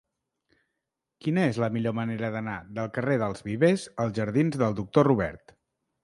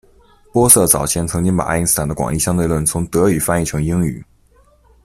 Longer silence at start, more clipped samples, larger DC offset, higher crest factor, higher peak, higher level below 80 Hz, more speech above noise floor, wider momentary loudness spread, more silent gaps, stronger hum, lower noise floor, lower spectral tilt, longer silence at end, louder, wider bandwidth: first, 1.25 s vs 0.55 s; neither; neither; first, 22 dB vs 16 dB; second, -6 dBFS vs 0 dBFS; second, -58 dBFS vs -36 dBFS; first, 58 dB vs 36 dB; about the same, 10 LU vs 10 LU; neither; neither; first, -84 dBFS vs -52 dBFS; first, -7.5 dB/octave vs -4.5 dB/octave; second, 0.65 s vs 0.8 s; second, -27 LUFS vs -15 LUFS; second, 11.5 kHz vs 16 kHz